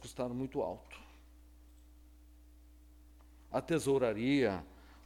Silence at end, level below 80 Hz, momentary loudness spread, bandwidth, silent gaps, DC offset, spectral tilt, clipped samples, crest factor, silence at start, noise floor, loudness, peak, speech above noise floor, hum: 0.05 s; -58 dBFS; 21 LU; 16.5 kHz; none; under 0.1%; -6 dB/octave; under 0.1%; 18 dB; 0 s; -59 dBFS; -35 LUFS; -20 dBFS; 25 dB; 60 Hz at -60 dBFS